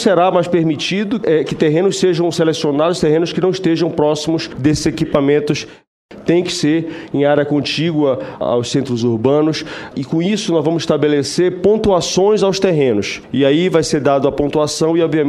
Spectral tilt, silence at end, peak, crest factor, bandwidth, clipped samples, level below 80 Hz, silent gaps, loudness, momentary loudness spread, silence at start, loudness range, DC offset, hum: -5.5 dB/octave; 0 s; 0 dBFS; 14 dB; 12.5 kHz; under 0.1%; -44 dBFS; 5.87-6.09 s; -15 LUFS; 5 LU; 0 s; 3 LU; under 0.1%; none